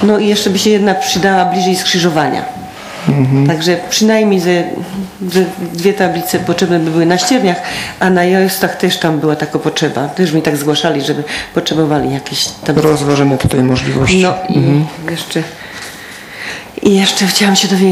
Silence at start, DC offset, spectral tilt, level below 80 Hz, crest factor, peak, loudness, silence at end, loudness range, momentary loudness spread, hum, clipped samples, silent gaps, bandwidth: 0 s; under 0.1%; -4.5 dB/octave; -42 dBFS; 12 dB; 0 dBFS; -12 LUFS; 0 s; 2 LU; 10 LU; none; under 0.1%; none; 16 kHz